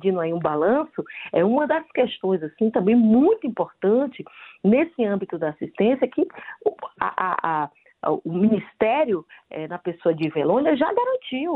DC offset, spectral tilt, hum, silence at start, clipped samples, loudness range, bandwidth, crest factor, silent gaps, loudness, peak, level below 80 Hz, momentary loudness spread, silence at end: under 0.1%; -10.5 dB/octave; none; 0 s; under 0.1%; 3 LU; 4.6 kHz; 16 dB; none; -22 LUFS; -6 dBFS; -64 dBFS; 10 LU; 0 s